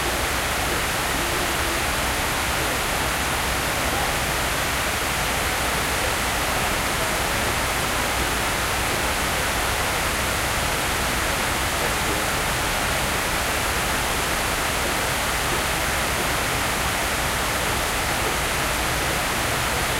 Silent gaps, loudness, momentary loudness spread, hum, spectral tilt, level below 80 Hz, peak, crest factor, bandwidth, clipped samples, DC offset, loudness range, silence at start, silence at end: none; -22 LUFS; 0 LU; none; -2.5 dB/octave; -34 dBFS; -10 dBFS; 14 dB; 16 kHz; under 0.1%; under 0.1%; 0 LU; 0 s; 0 s